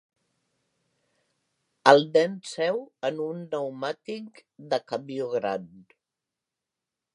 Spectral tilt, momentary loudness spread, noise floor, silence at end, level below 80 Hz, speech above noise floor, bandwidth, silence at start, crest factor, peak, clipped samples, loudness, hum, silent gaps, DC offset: -4.5 dB/octave; 17 LU; -87 dBFS; 1.35 s; -80 dBFS; 61 dB; 11.5 kHz; 1.85 s; 28 dB; -2 dBFS; under 0.1%; -26 LUFS; none; none; under 0.1%